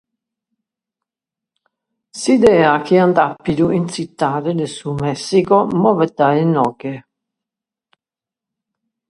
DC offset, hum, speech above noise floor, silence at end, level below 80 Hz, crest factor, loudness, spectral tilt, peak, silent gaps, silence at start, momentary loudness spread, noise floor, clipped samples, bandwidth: under 0.1%; none; 74 dB; 2.1 s; -52 dBFS; 18 dB; -15 LUFS; -6.5 dB/octave; 0 dBFS; none; 2.15 s; 11 LU; -88 dBFS; under 0.1%; 11.5 kHz